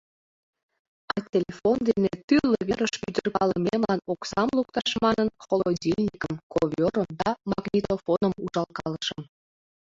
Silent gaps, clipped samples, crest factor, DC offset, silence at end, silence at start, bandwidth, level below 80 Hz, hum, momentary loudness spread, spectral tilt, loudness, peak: 2.24-2.28 s, 6.43-6.50 s; under 0.1%; 18 dB; under 0.1%; 0.7 s; 1.1 s; 7.8 kHz; -56 dBFS; none; 7 LU; -6 dB/octave; -26 LUFS; -8 dBFS